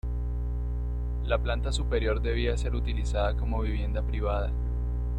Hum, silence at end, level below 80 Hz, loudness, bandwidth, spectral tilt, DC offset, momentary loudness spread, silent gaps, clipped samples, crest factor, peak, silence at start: 60 Hz at -30 dBFS; 0 s; -28 dBFS; -30 LUFS; 9 kHz; -6.5 dB/octave; under 0.1%; 5 LU; none; under 0.1%; 14 dB; -12 dBFS; 0.05 s